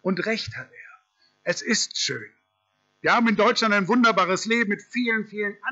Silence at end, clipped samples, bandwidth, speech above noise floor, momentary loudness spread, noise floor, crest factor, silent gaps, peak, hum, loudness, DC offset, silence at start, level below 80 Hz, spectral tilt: 0 s; under 0.1%; 8.2 kHz; 48 dB; 13 LU; -71 dBFS; 14 dB; none; -10 dBFS; none; -22 LUFS; under 0.1%; 0.05 s; -68 dBFS; -3.5 dB/octave